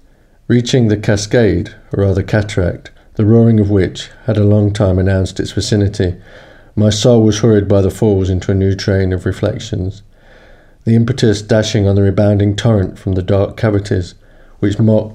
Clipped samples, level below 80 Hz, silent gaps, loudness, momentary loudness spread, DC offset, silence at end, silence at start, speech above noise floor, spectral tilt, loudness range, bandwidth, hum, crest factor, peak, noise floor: under 0.1%; -36 dBFS; none; -14 LUFS; 9 LU; under 0.1%; 0 s; 0.5 s; 29 dB; -6.5 dB/octave; 3 LU; 10 kHz; none; 12 dB; 0 dBFS; -42 dBFS